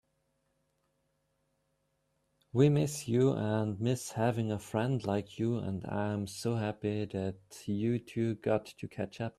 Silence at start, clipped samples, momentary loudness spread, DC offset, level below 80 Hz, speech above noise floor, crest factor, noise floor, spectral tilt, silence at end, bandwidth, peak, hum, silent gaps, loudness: 2.55 s; under 0.1%; 10 LU; under 0.1%; -66 dBFS; 46 dB; 22 dB; -78 dBFS; -7 dB/octave; 0.1 s; 13.5 kHz; -12 dBFS; none; none; -33 LUFS